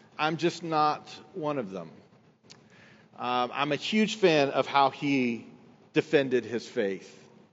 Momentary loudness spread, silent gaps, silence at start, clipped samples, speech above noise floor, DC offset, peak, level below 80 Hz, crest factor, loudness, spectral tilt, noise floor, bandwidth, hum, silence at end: 14 LU; none; 0.2 s; under 0.1%; 29 dB; under 0.1%; -8 dBFS; -82 dBFS; 20 dB; -28 LUFS; -3.5 dB/octave; -57 dBFS; 8 kHz; none; 0.4 s